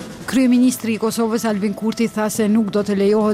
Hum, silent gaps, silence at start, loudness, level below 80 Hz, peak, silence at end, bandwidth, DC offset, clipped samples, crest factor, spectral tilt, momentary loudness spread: none; none; 0 s; -18 LUFS; -54 dBFS; -8 dBFS; 0 s; 16 kHz; under 0.1%; under 0.1%; 10 dB; -5.5 dB/octave; 6 LU